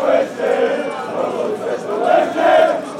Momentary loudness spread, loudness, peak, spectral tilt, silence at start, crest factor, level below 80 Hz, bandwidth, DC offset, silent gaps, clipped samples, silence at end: 9 LU; -17 LUFS; -2 dBFS; -4.5 dB/octave; 0 s; 14 dB; -64 dBFS; 12.5 kHz; under 0.1%; none; under 0.1%; 0 s